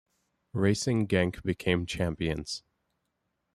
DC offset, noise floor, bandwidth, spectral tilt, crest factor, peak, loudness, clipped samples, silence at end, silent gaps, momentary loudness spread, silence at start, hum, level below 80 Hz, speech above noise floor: under 0.1%; -80 dBFS; 13 kHz; -5.5 dB/octave; 20 dB; -10 dBFS; -30 LUFS; under 0.1%; 0.95 s; none; 11 LU; 0.55 s; none; -52 dBFS; 51 dB